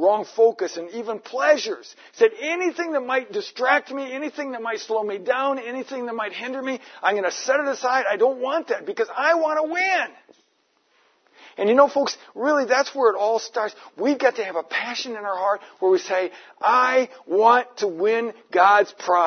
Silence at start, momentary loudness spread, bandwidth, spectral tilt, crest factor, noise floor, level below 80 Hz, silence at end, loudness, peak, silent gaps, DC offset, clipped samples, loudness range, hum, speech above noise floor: 0 s; 12 LU; 6.6 kHz; -2.5 dB/octave; 20 dB; -66 dBFS; -86 dBFS; 0 s; -22 LUFS; -2 dBFS; none; under 0.1%; under 0.1%; 4 LU; none; 44 dB